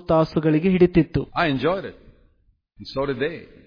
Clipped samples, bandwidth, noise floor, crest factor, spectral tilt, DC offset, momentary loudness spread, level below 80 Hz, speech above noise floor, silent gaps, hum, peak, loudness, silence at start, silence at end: under 0.1%; 5.2 kHz; -62 dBFS; 18 dB; -9 dB/octave; under 0.1%; 13 LU; -42 dBFS; 42 dB; none; none; -4 dBFS; -21 LUFS; 0.1 s; 0.2 s